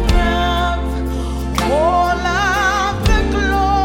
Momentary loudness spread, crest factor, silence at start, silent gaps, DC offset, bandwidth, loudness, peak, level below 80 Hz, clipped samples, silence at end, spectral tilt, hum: 7 LU; 14 dB; 0 s; none; under 0.1%; 16.5 kHz; -17 LUFS; -2 dBFS; -20 dBFS; under 0.1%; 0 s; -5 dB/octave; none